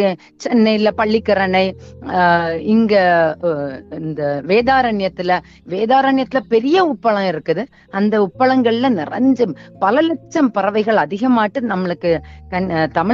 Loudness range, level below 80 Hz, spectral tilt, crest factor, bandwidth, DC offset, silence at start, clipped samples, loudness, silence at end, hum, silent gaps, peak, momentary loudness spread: 2 LU; -48 dBFS; -7 dB/octave; 14 dB; 7.4 kHz; under 0.1%; 0 s; under 0.1%; -16 LUFS; 0 s; none; none; -2 dBFS; 8 LU